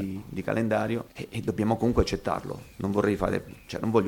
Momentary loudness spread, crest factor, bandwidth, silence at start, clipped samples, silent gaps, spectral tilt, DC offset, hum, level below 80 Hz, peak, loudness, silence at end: 9 LU; 18 dB; 18 kHz; 0 s; under 0.1%; none; -7 dB/octave; under 0.1%; none; -42 dBFS; -10 dBFS; -28 LUFS; 0 s